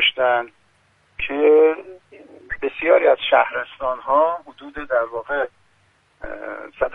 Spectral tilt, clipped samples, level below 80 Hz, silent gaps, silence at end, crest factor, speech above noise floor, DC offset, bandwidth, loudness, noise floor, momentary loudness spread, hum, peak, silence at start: -5.5 dB/octave; under 0.1%; -50 dBFS; none; 0 s; 18 dB; 41 dB; under 0.1%; 3.9 kHz; -19 LUFS; -60 dBFS; 19 LU; none; -2 dBFS; 0 s